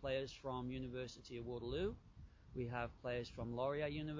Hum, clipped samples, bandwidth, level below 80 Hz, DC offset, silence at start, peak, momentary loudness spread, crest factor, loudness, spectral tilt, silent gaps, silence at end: none; under 0.1%; 7.6 kHz; -60 dBFS; under 0.1%; 0 s; -28 dBFS; 10 LU; 16 dB; -45 LUFS; -6.5 dB/octave; none; 0 s